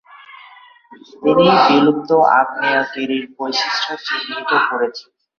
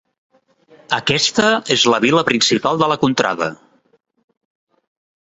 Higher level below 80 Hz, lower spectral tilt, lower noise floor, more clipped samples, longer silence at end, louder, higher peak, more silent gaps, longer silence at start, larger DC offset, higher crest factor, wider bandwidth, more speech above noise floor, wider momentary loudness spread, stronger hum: about the same, -60 dBFS vs -58 dBFS; first, -5 dB/octave vs -3.5 dB/octave; second, -44 dBFS vs -51 dBFS; neither; second, 0.4 s vs 1.85 s; about the same, -16 LUFS vs -15 LUFS; about the same, -2 dBFS vs -2 dBFS; neither; second, 0.15 s vs 0.9 s; neither; about the same, 16 dB vs 18 dB; second, 7 kHz vs 8.2 kHz; second, 28 dB vs 35 dB; first, 11 LU vs 7 LU; neither